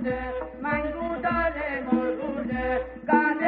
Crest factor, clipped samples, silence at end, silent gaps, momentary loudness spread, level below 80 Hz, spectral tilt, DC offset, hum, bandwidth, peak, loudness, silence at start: 18 dB; under 0.1%; 0 s; none; 7 LU; -44 dBFS; -5 dB/octave; under 0.1%; none; 4.8 kHz; -8 dBFS; -27 LUFS; 0 s